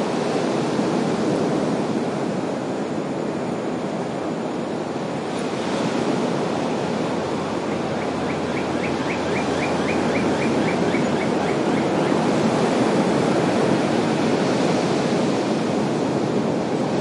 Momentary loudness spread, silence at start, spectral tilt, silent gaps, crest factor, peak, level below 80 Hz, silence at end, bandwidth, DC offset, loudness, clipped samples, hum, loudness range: 6 LU; 0 s; -6 dB/octave; none; 14 dB; -6 dBFS; -58 dBFS; 0 s; 11.5 kHz; under 0.1%; -22 LUFS; under 0.1%; none; 5 LU